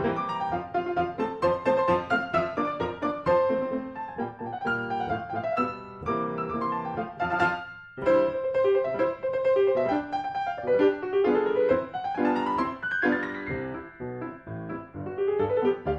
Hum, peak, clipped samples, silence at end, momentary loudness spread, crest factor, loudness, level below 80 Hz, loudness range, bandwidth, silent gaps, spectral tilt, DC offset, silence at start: none; -10 dBFS; under 0.1%; 0 s; 12 LU; 16 dB; -27 LUFS; -56 dBFS; 5 LU; 7.8 kHz; none; -7.5 dB/octave; under 0.1%; 0 s